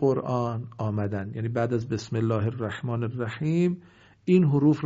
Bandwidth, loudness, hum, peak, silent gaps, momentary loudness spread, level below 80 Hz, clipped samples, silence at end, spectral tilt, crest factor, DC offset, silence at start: 7.8 kHz; -27 LUFS; none; -8 dBFS; none; 10 LU; -62 dBFS; under 0.1%; 0 s; -8 dB/octave; 16 dB; under 0.1%; 0 s